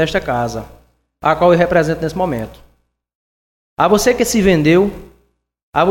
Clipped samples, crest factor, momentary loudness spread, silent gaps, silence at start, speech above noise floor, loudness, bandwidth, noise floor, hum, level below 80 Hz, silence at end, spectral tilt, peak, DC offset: under 0.1%; 16 dB; 12 LU; 3.15-3.77 s, 5.63-5.73 s; 0 s; 44 dB; -15 LUFS; 16.5 kHz; -59 dBFS; none; -38 dBFS; 0 s; -5.5 dB/octave; 0 dBFS; under 0.1%